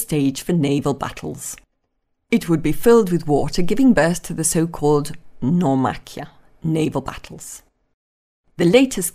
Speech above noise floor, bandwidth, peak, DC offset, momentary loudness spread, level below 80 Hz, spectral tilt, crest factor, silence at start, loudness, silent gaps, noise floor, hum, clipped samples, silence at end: 53 dB; 15.5 kHz; 0 dBFS; under 0.1%; 20 LU; -40 dBFS; -5.5 dB/octave; 18 dB; 0 s; -19 LUFS; 7.94-8.44 s; -71 dBFS; none; under 0.1%; 0.05 s